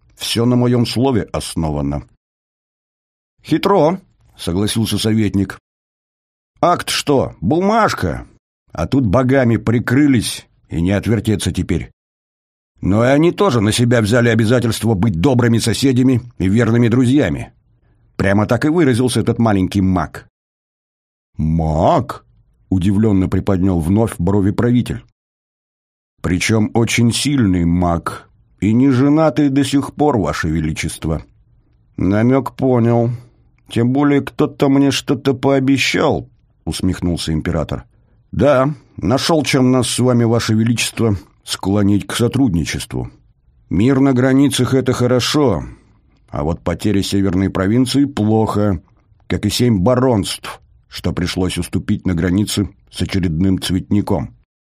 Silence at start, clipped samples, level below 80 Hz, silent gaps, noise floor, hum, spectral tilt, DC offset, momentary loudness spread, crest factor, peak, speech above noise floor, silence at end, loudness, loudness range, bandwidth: 0.2 s; under 0.1%; -38 dBFS; 2.17-3.37 s, 5.60-6.54 s, 8.39-8.66 s, 11.93-12.75 s, 20.30-21.33 s, 25.12-26.17 s; -55 dBFS; none; -6 dB/octave; under 0.1%; 11 LU; 16 dB; 0 dBFS; 40 dB; 0.45 s; -16 LUFS; 4 LU; 15.5 kHz